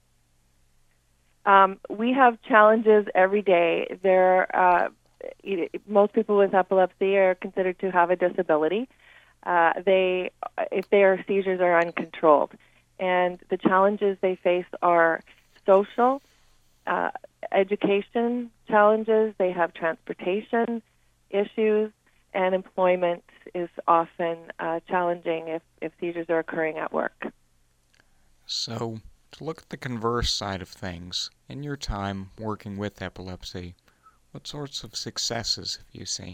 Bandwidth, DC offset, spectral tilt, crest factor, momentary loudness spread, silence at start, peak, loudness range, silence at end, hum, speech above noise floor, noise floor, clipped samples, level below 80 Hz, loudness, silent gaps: 15 kHz; under 0.1%; -4.5 dB/octave; 22 dB; 15 LU; 1.45 s; -2 dBFS; 11 LU; 0 s; none; 41 dB; -65 dBFS; under 0.1%; -52 dBFS; -24 LUFS; none